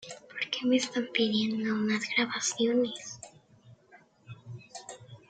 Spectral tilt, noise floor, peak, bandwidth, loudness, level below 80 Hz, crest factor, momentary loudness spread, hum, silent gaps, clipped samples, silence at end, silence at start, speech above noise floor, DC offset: -3 dB/octave; -60 dBFS; -10 dBFS; 9.4 kHz; -29 LUFS; -76 dBFS; 20 dB; 19 LU; none; none; under 0.1%; 0.15 s; 0 s; 31 dB; under 0.1%